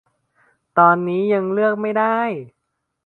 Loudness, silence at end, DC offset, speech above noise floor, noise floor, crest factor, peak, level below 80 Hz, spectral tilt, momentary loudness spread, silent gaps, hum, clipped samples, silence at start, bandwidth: -18 LUFS; 0.55 s; under 0.1%; 44 dB; -61 dBFS; 20 dB; 0 dBFS; -70 dBFS; -9.5 dB/octave; 9 LU; none; none; under 0.1%; 0.75 s; 4.3 kHz